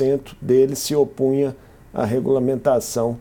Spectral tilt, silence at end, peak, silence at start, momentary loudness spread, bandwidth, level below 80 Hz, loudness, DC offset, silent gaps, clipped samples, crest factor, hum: -6 dB/octave; 0 s; -4 dBFS; 0 s; 8 LU; 18 kHz; -50 dBFS; -20 LUFS; under 0.1%; none; under 0.1%; 14 dB; none